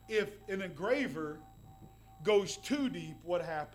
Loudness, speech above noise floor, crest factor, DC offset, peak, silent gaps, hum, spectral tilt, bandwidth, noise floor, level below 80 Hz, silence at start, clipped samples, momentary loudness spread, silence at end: -35 LUFS; 21 dB; 18 dB; under 0.1%; -18 dBFS; none; none; -4.5 dB/octave; 16.5 kHz; -56 dBFS; -62 dBFS; 0 s; under 0.1%; 11 LU; 0 s